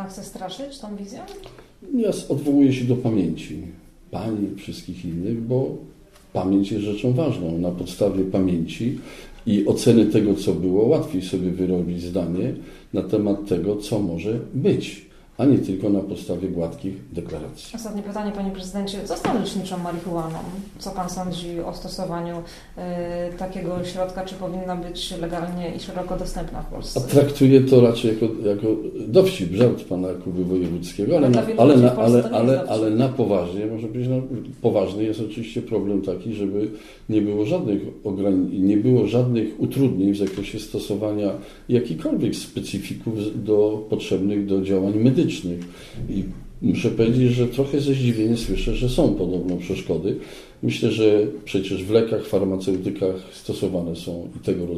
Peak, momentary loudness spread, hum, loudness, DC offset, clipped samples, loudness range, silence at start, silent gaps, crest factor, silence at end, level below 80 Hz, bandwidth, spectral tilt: -2 dBFS; 14 LU; none; -22 LUFS; under 0.1%; under 0.1%; 10 LU; 0 s; none; 20 dB; 0 s; -42 dBFS; 14 kHz; -7 dB/octave